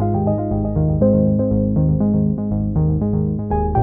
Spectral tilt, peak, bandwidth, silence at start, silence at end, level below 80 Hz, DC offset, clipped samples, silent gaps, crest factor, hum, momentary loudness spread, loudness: -14.5 dB/octave; -4 dBFS; 2.5 kHz; 0 s; 0 s; -28 dBFS; under 0.1%; under 0.1%; none; 12 dB; none; 5 LU; -18 LUFS